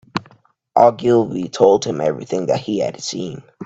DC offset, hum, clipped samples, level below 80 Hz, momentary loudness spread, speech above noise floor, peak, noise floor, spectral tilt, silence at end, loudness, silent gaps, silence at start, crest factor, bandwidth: under 0.1%; none; under 0.1%; -58 dBFS; 14 LU; 35 dB; 0 dBFS; -52 dBFS; -5.5 dB/octave; 0 s; -18 LUFS; none; 0.15 s; 18 dB; 8 kHz